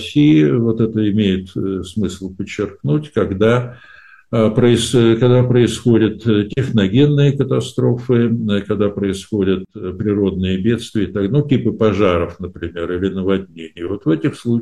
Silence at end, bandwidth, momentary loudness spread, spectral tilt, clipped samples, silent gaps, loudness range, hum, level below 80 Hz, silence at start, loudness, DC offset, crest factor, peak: 0 s; 12 kHz; 10 LU; -7 dB/octave; under 0.1%; none; 4 LU; none; -44 dBFS; 0 s; -16 LUFS; 0.2%; 12 dB; -2 dBFS